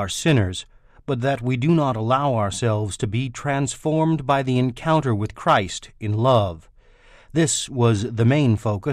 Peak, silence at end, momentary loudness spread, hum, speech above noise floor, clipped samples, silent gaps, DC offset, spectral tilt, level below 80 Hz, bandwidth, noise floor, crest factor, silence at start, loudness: -6 dBFS; 0 s; 8 LU; none; 30 dB; under 0.1%; none; under 0.1%; -5.5 dB/octave; -48 dBFS; 13 kHz; -50 dBFS; 14 dB; 0 s; -21 LUFS